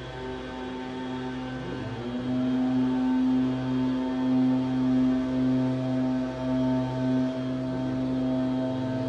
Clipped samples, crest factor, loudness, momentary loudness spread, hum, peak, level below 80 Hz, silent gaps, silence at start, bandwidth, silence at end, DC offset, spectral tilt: under 0.1%; 10 dB; -27 LUFS; 10 LU; none; -16 dBFS; -52 dBFS; none; 0 s; 7.2 kHz; 0 s; under 0.1%; -8 dB/octave